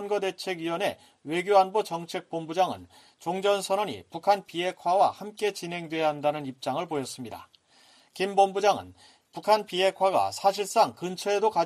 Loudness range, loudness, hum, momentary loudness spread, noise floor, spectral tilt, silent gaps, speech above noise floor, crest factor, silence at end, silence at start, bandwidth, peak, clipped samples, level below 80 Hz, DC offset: 4 LU; -27 LUFS; none; 11 LU; -59 dBFS; -4 dB/octave; none; 32 dB; 18 dB; 0 s; 0 s; 15 kHz; -8 dBFS; under 0.1%; -74 dBFS; under 0.1%